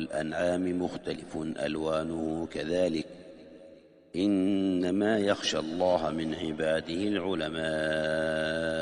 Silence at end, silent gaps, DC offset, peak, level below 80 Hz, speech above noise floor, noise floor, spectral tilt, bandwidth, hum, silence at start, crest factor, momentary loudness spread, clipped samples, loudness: 0 s; none; under 0.1%; -12 dBFS; -58 dBFS; 24 dB; -54 dBFS; -5.5 dB/octave; 10.5 kHz; none; 0 s; 18 dB; 9 LU; under 0.1%; -30 LUFS